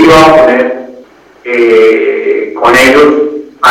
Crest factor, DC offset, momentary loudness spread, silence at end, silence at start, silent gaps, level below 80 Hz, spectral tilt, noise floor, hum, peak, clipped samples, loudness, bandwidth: 6 dB; under 0.1%; 12 LU; 0 s; 0 s; none; -36 dBFS; -4.5 dB/octave; -35 dBFS; none; 0 dBFS; 5%; -6 LUFS; 16.5 kHz